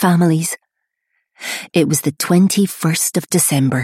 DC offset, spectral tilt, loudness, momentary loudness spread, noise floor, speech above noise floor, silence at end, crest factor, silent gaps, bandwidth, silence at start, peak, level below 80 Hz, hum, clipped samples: under 0.1%; -4.5 dB/octave; -16 LUFS; 12 LU; -73 dBFS; 58 dB; 0 s; 14 dB; none; 16 kHz; 0 s; -2 dBFS; -60 dBFS; none; under 0.1%